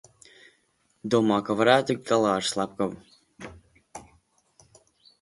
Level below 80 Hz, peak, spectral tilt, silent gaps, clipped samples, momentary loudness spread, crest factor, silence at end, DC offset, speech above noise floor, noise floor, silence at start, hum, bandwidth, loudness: -64 dBFS; -6 dBFS; -4.5 dB/octave; none; under 0.1%; 25 LU; 22 dB; 1.2 s; under 0.1%; 45 dB; -69 dBFS; 1.05 s; none; 11.5 kHz; -24 LUFS